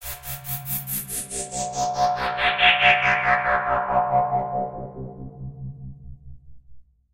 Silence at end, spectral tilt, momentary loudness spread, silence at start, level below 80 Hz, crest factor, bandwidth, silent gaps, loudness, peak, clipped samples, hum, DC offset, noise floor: 0.35 s; -2.5 dB/octave; 21 LU; 0 s; -48 dBFS; 22 dB; 16 kHz; none; -21 LUFS; -2 dBFS; under 0.1%; none; 0.3%; -46 dBFS